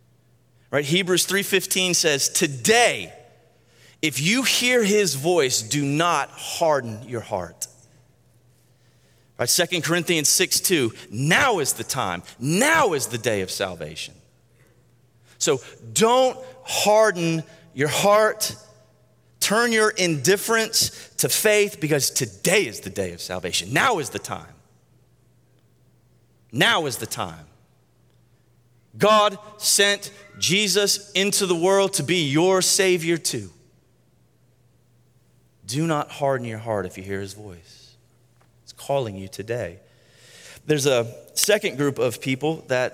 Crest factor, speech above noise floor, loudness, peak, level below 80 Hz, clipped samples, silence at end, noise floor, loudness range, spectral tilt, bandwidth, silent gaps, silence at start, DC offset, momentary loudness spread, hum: 24 dB; 39 dB; -21 LUFS; 0 dBFS; -64 dBFS; under 0.1%; 0.05 s; -61 dBFS; 9 LU; -3 dB/octave; 16.5 kHz; none; 0.7 s; under 0.1%; 13 LU; none